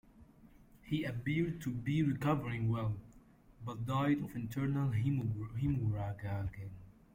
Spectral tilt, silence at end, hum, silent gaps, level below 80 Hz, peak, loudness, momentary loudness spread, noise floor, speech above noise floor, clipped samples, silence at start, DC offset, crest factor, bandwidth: -8 dB/octave; 0.25 s; none; none; -58 dBFS; -20 dBFS; -36 LUFS; 11 LU; -61 dBFS; 26 dB; under 0.1%; 0.15 s; under 0.1%; 16 dB; 16.5 kHz